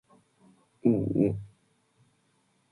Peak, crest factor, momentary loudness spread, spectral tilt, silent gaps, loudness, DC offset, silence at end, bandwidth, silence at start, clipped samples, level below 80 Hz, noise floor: -10 dBFS; 22 dB; 15 LU; -11 dB/octave; none; -28 LUFS; under 0.1%; 1.25 s; 10.5 kHz; 0.85 s; under 0.1%; -58 dBFS; -70 dBFS